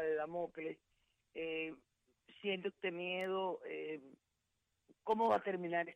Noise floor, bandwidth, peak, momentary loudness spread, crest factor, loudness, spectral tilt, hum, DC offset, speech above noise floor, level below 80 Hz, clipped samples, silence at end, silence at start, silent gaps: -85 dBFS; 11 kHz; -22 dBFS; 14 LU; 18 dB; -40 LUFS; -6.5 dB/octave; none; under 0.1%; 45 dB; -82 dBFS; under 0.1%; 0 s; 0 s; none